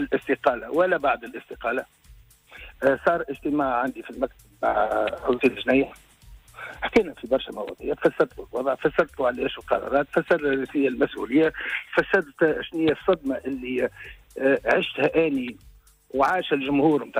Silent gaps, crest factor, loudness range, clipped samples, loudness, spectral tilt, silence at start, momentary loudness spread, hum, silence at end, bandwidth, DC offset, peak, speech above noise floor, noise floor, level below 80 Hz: none; 16 dB; 3 LU; under 0.1%; -24 LUFS; -6 dB/octave; 0 s; 10 LU; none; 0 s; 16 kHz; under 0.1%; -8 dBFS; 28 dB; -52 dBFS; -52 dBFS